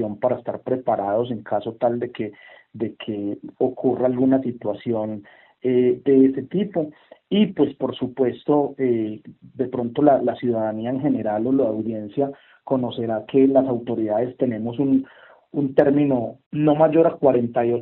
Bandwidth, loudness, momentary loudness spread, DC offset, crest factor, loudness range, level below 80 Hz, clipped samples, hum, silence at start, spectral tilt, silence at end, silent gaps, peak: 4.1 kHz; -22 LUFS; 12 LU; under 0.1%; 20 dB; 4 LU; -64 dBFS; under 0.1%; none; 0 s; -7 dB/octave; 0 s; 16.46-16.51 s; 0 dBFS